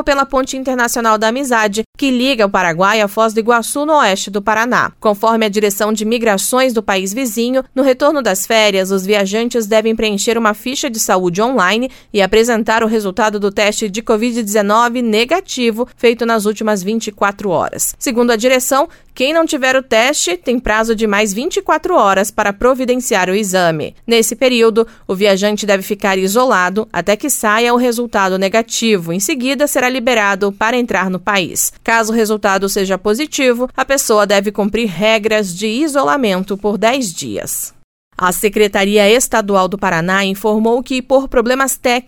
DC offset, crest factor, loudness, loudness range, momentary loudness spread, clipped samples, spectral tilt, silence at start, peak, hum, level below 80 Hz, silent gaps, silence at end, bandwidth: under 0.1%; 14 dB; -14 LUFS; 1 LU; 5 LU; under 0.1%; -3.5 dB/octave; 0 s; 0 dBFS; none; -42 dBFS; 1.86-1.93 s, 37.84-38.11 s; 0.05 s; 19 kHz